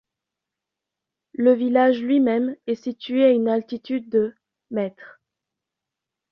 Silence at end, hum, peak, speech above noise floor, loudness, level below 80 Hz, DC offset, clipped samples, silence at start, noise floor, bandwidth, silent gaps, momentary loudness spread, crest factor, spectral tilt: 1.25 s; none; -6 dBFS; 65 dB; -21 LUFS; -70 dBFS; under 0.1%; under 0.1%; 1.4 s; -86 dBFS; 6 kHz; none; 11 LU; 18 dB; -7.5 dB/octave